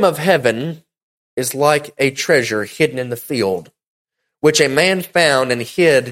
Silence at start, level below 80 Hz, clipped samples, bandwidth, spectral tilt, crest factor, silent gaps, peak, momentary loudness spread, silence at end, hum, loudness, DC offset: 0 s; -58 dBFS; under 0.1%; 16.5 kHz; -4 dB/octave; 16 dB; 1.03-1.37 s, 3.87-4.05 s; 0 dBFS; 11 LU; 0 s; none; -16 LUFS; under 0.1%